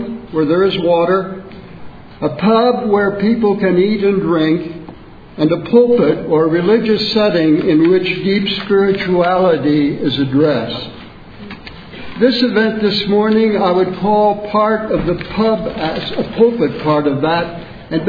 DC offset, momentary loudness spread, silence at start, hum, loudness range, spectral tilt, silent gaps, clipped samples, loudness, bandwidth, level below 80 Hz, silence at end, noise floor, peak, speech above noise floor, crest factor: 0.4%; 11 LU; 0 s; none; 3 LU; -8 dB/octave; none; under 0.1%; -14 LUFS; 5 kHz; -42 dBFS; 0 s; -35 dBFS; 0 dBFS; 22 dB; 14 dB